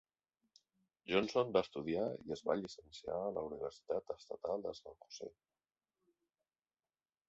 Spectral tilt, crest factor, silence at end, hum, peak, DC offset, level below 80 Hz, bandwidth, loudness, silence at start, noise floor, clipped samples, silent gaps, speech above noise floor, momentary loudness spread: -4 dB/octave; 24 dB; 2 s; none; -18 dBFS; under 0.1%; -72 dBFS; 8 kHz; -40 LUFS; 1.05 s; under -90 dBFS; under 0.1%; none; over 50 dB; 16 LU